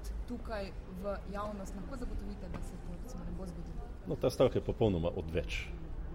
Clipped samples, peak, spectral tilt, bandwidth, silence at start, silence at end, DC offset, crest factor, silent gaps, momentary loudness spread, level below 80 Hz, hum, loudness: under 0.1%; -16 dBFS; -6.5 dB/octave; 16 kHz; 0 s; 0 s; under 0.1%; 20 dB; none; 15 LU; -44 dBFS; none; -38 LUFS